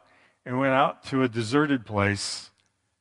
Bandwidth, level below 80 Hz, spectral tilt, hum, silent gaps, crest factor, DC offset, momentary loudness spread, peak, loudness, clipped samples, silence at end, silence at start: 11.5 kHz; -66 dBFS; -5 dB/octave; none; none; 20 dB; under 0.1%; 10 LU; -6 dBFS; -25 LUFS; under 0.1%; 0.55 s; 0.45 s